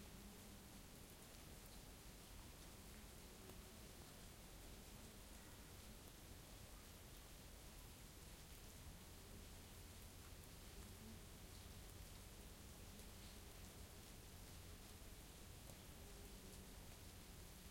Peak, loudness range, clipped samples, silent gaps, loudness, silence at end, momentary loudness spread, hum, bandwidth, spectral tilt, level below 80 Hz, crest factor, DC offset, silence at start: -40 dBFS; 1 LU; under 0.1%; none; -60 LUFS; 0 s; 1 LU; none; 16.5 kHz; -3.5 dB/octave; -64 dBFS; 18 dB; under 0.1%; 0 s